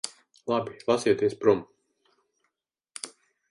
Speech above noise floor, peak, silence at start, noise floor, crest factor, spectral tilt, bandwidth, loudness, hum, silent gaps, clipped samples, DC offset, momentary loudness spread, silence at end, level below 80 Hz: 57 dB; -8 dBFS; 0.05 s; -82 dBFS; 22 dB; -4.5 dB/octave; 11.5 kHz; -26 LUFS; none; none; under 0.1%; under 0.1%; 17 LU; 0.45 s; -68 dBFS